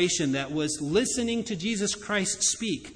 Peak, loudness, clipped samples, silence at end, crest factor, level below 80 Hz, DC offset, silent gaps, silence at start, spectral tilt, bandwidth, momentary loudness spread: -10 dBFS; -27 LUFS; under 0.1%; 0 s; 18 dB; -56 dBFS; under 0.1%; none; 0 s; -3 dB/octave; 10.5 kHz; 5 LU